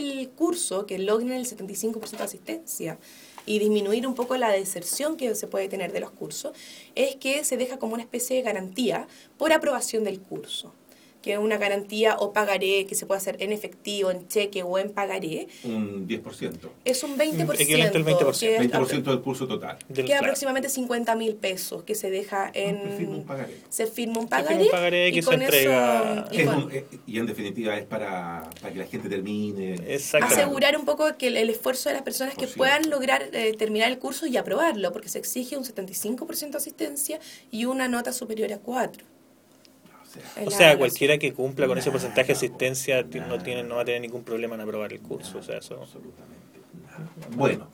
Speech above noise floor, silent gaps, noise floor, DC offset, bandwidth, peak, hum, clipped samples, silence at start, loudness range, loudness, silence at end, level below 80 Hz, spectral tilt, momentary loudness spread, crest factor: 31 dB; none; -56 dBFS; under 0.1%; 19.5 kHz; 0 dBFS; none; under 0.1%; 0 s; 7 LU; -25 LUFS; 0.05 s; -68 dBFS; -3.5 dB/octave; 13 LU; 26 dB